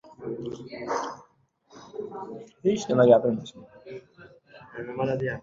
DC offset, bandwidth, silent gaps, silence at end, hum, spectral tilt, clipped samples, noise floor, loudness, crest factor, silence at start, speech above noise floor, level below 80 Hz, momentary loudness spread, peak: under 0.1%; 7.8 kHz; none; 0 s; none; -6.5 dB/octave; under 0.1%; -62 dBFS; -26 LUFS; 22 dB; 0.05 s; 36 dB; -64 dBFS; 25 LU; -4 dBFS